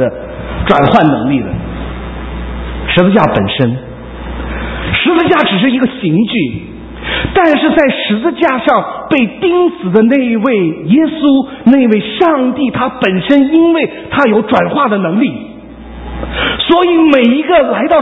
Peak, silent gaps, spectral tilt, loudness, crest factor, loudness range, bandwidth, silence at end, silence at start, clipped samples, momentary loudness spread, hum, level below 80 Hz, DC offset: 0 dBFS; none; -8.5 dB/octave; -11 LUFS; 10 dB; 3 LU; 5.8 kHz; 0 s; 0 s; 0.3%; 15 LU; none; -30 dBFS; under 0.1%